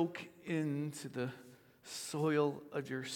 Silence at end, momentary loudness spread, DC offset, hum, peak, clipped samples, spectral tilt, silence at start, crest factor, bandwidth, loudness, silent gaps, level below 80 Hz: 0 s; 14 LU; under 0.1%; none; -20 dBFS; under 0.1%; -5.5 dB/octave; 0 s; 18 dB; 18 kHz; -39 LUFS; none; -84 dBFS